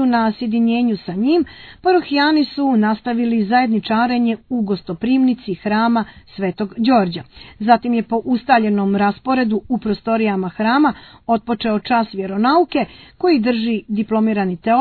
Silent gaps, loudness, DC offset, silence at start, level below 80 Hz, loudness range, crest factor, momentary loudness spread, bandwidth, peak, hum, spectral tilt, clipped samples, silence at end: none; -17 LUFS; under 0.1%; 0 s; -52 dBFS; 2 LU; 16 dB; 7 LU; 4.6 kHz; 0 dBFS; none; -9 dB/octave; under 0.1%; 0 s